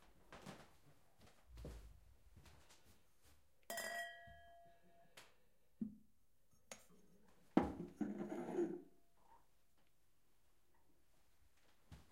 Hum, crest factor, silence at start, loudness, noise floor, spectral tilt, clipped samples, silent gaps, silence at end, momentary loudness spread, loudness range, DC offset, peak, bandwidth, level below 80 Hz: none; 32 dB; 0 s; -47 LUFS; -82 dBFS; -5 dB/octave; under 0.1%; none; 0.1 s; 26 LU; 14 LU; under 0.1%; -20 dBFS; 16 kHz; -70 dBFS